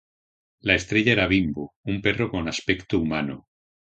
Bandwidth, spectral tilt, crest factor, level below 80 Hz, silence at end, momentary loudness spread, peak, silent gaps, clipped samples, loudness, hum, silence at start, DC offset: 8.8 kHz; -5.5 dB/octave; 24 dB; -46 dBFS; 0.55 s; 11 LU; -2 dBFS; 1.76-1.84 s; under 0.1%; -23 LUFS; none; 0.65 s; under 0.1%